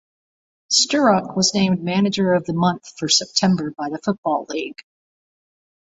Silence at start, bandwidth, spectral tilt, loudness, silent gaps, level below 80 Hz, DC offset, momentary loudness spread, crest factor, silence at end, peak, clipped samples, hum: 0.7 s; 8.2 kHz; -4 dB/octave; -19 LUFS; 4.18-4.23 s; -60 dBFS; under 0.1%; 11 LU; 18 dB; 1.15 s; -2 dBFS; under 0.1%; none